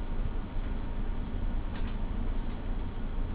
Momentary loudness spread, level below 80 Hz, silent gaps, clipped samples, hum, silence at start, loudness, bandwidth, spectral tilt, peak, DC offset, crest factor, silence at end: 2 LU; -34 dBFS; none; under 0.1%; none; 0 s; -38 LUFS; 4 kHz; -10.5 dB/octave; -22 dBFS; under 0.1%; 10 dB; 0 s